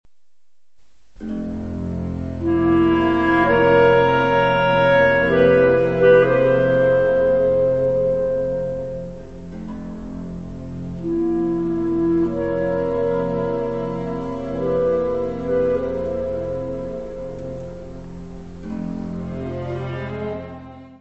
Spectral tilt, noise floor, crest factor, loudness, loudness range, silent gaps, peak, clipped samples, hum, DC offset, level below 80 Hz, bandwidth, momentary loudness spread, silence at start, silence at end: -8 dB/octave; -76 dBFS; 18 dB; -19 LUFS; 14 LU; none; -2 dBFS; under 0.1%; none; 0.7%; -42 dBFS; 7.4 kHz; 18 LU; 1.2 s; 0 s